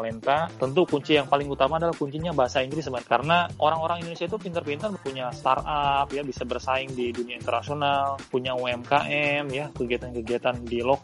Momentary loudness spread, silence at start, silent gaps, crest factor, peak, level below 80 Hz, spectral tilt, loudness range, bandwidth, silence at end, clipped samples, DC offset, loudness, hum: 9 LU; 0 s; none; 20 dB; -4 dBFS; -50 dBFS; -5.5 dB/octave; 3 LU; 11.5 kHz; 0 s; under 0.1%; under 0.1%; -26 LUFS; none